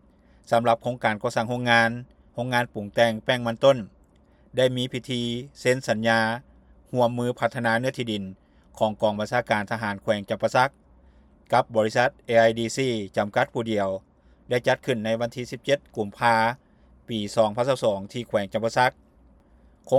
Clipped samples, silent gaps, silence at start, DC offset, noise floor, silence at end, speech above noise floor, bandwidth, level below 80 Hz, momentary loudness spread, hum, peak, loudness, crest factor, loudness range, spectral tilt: under 0.1%; none; 0.5 s; under 0.1%; -57 dBFS; 0 s; 33 dB; 14.5 kHz; -58 dBFS; 10 LU; none; -4 dBFS; -24 LUFS; 20 dB; 3 LU; -5 dB/octave